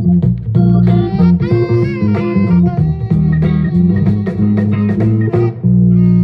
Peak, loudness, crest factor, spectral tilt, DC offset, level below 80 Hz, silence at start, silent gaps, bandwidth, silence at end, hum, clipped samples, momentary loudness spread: -2 dBFS; -12 LUFS; 10 dB; -11.5 dB/octave; under 0.1%; -32 dBFS; 0 s; none; 5 kHz; 0 s; none; under 0.1%; 4 LU